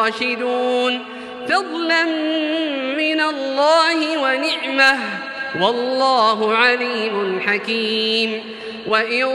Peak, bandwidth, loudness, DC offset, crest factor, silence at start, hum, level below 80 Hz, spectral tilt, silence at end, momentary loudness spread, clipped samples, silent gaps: 0 dBFS; 12.5 kHz; -18 LUFS; under 0.1%; 18 dB; 0 s; none; -70 dBFS; -3.5 dB/octave; 0 s; 8 LU; under 0.1%; none